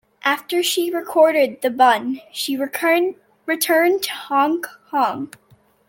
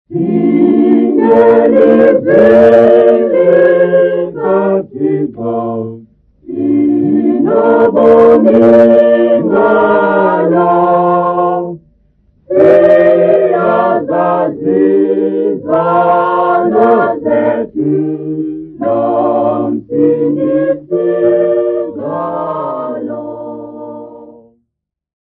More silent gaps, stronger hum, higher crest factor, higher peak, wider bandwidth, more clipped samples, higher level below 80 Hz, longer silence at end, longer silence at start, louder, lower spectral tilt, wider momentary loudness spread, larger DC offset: neither; neither; first, 16 dB vs 10 dB; about the same, -2 dBFS vs 0 dBFS; first, 17 kHz vs 4.7 kHz; second, under 0.1% vs 0.8%; second, -72 dBFS vs -50 dBFS; second, 0.65 s vs 0.95 s; first, 0.25 s vs 0.1 s; second, -19 LUFS vs -10 LUFS; second, -2 dB/octave vs -9.5 dB/octave; second, 10 LU vs 13 LU; neither